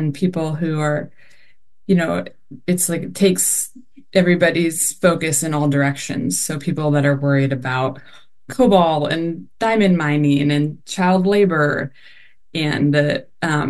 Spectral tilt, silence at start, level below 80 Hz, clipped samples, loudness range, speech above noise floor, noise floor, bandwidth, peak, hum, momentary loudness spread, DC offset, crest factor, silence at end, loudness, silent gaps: -5 dB/octave; 0 s; -52 dBFS; under 0.1%; 3 LU; 41 dB; -59 dBFS; 12.5 kHz; -2 dBFS; none; 10 LU; 0.7%; 16 dB; 0 s; -18 LUFS; none